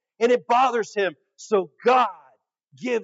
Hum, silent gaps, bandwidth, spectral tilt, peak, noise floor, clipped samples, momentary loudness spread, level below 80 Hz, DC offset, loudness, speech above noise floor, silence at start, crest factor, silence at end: none; none; 7.8 kHz; -4 dB/octave; -6 dBFS; -61 dBFS; under 0.1%; 8 LU; under -90 dBFS; under 0.1%; -22 LUFS; 39 dB; 0.2 s; 18 dB; 0 s